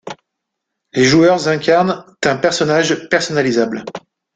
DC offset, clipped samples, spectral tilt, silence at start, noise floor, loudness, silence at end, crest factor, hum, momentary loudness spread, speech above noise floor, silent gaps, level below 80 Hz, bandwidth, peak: under 0.1%; under 0.1%; -4.5 dB/octave; 0.05 s; -77 dBFS; -15 LUFS; 0.35 s; 14 dB; none; 14 LU; 63 dB; none; -54 dBFS; 9.4 kHz; -2 dBFS